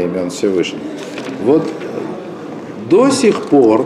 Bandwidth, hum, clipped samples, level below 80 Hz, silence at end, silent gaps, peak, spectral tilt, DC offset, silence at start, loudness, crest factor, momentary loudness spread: 12.5 kHz; none; under 0.1%; -58 dBFS; 0 s; none; -2 dBFS; -5.5 dB/octave; under 0.1%; 0 s; -15 LUFS; 14 dB; 16 LU